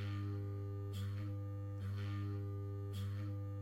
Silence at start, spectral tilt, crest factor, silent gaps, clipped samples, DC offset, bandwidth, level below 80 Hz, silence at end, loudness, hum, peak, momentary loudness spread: 0 s; -8 dB/octave; 10 dB; none; under 0.1%; under 0.1%; 14 kHz; -68 dBFS; 0 s; -44 LUFS; none; -34 dBFS; 2 LU